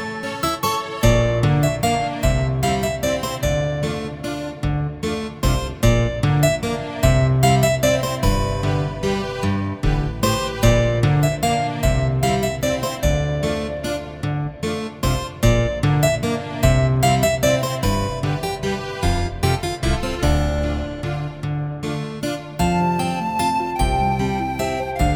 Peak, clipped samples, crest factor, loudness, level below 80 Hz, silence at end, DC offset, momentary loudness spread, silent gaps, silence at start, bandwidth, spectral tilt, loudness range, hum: -2 dBFS; under 0.1%; 18 dB; -20 LUFS; -28 dBFS; 0 s; under 0.1%; 9 LU; none; 0 s; over 20 kHz; -5.5 dB/octave; 4 LU; none